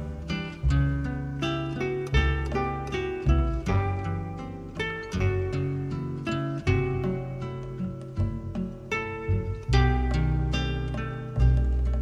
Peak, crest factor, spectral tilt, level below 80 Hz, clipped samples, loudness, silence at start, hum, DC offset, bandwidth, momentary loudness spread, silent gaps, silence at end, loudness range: -10 dBFS; 16 dB; -7 dB/octave; -30 dBFS; under 0.1%; -28 LUFS; 0 s; none; under 0.1%; 8 kHz; 9 LU; none; 0 s; 3 LU